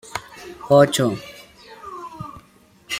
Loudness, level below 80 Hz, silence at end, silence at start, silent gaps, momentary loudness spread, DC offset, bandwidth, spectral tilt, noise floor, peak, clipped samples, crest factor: -17 LUFS; -56 dBFS; 0 s; 0.15 s; none; 25 LU; under 0.1%; 16.5 kHz; -5 dB/octave; -53 dBFS; -2 dBFS; under 0.1%; 20 dB